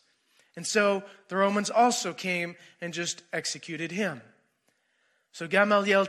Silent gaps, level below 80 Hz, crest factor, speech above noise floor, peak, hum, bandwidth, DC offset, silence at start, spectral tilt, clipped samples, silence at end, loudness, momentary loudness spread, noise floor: none; -86 dBFS; 20 dB; 45 dB; -10 dBFS; none; 14 kHz; under 0.1%; 0.55 s; -3.5 dB/octave; under 0.1%; 0 s; -27 LUFS; 13 LU; -73 dBFS